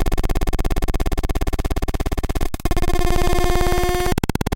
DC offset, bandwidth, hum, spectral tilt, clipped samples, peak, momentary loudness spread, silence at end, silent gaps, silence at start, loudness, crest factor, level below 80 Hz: under 0.1%; 17 kHz; none; -5.5 dB/octave; under 0.1%; -4 dBFS; 5 LU; 0 s; none; 0 s; -23 LUFS; 14 dB; -20 dBFS